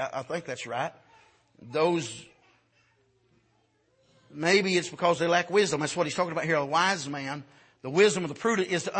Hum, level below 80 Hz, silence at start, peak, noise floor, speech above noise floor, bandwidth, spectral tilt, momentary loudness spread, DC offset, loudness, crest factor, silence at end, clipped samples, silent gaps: none; -72 dBFS; 0 s; -8 dBFS; -69 dBFS; 42 dB; 8.8 kHz; -4 dB/octave; 13 LU; under 0.1%; -27 LUFS; 20 dB; 0 s; under 0.1%; none